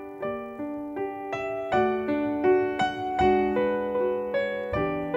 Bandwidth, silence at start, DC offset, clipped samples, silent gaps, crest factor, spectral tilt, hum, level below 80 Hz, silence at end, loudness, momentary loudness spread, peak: 7.4 kHz; 0 s; under 0.1%; under 0.1%; none; 16 dB; -7 dB/octave; none; -50 dBFS; 0 s; -27 LUFS; 10 LU; -10 dBFS